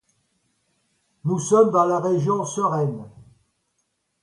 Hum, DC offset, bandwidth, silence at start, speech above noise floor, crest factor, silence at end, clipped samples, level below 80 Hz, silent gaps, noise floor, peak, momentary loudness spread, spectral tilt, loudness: none; under 0.1%; 11.5 kHz; 1.25 s; 53 dB; 20 dB; 1.15 s; under 0.1%; -66 dBFS; none; -73 dBFS; -4 dBFS; 11 LU; -7 dB/octave; -21 LUFS